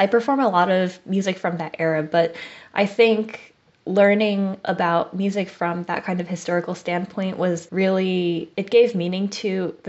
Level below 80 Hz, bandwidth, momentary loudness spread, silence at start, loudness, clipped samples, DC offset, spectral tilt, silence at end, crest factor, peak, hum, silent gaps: -70 dBFS; 8 kHz; 9 LU; 0 s; -21 LUFS; under 0.1%; under 0.1%; -4.5 dB/octave; 0 s; 18 dB; -4 dBFS; none; none